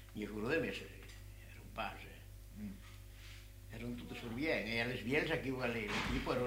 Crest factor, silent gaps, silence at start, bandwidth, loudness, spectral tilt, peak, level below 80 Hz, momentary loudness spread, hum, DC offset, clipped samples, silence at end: 18 dB; none; 0 s; 16 kHz; -40 LUFS; -5.5 dB/octave; -22 dBFS; -54 dBFS; 18 LU; none; under 0.1%; under 0.1%; 0 s